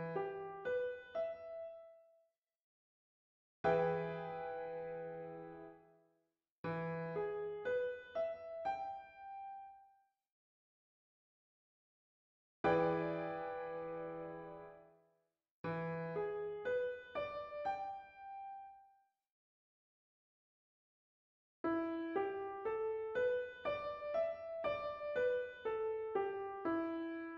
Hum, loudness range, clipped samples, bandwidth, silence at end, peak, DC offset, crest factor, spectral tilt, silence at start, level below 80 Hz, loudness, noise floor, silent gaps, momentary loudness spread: none; 9 LU; under 0.1%; 7 kHz; 0 s; -22 dBFS; under 0.1%; 20 dB; -5 dB/octave; 0 s; -74 dBFS; -42 LUFS; -84 dBFS; 2.38-2.42 s, 2.63-3.64 s, 6.51-6.64 s, 10.32-12.64 s, 15.51-15.64 s, 19.32-21.64 s; 14 LU